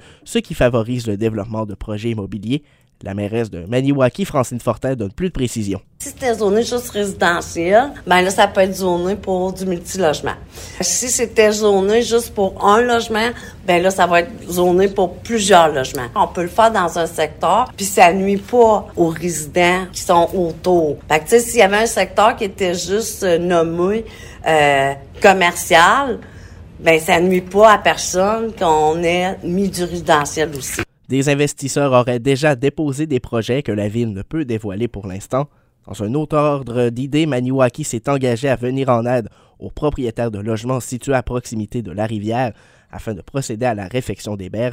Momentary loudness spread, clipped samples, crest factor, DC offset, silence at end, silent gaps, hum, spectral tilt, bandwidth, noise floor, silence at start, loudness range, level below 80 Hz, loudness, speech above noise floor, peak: 11 LU; under 0.1%; 16 dB; under 0.1%; 0 s; none; none; -4.5 dB/octave; 16.5 kHz; -37 dBFS; 0.25 s; 7 LU; -42 dBFS; -17 LUFS; 20 dB; 0 dBFS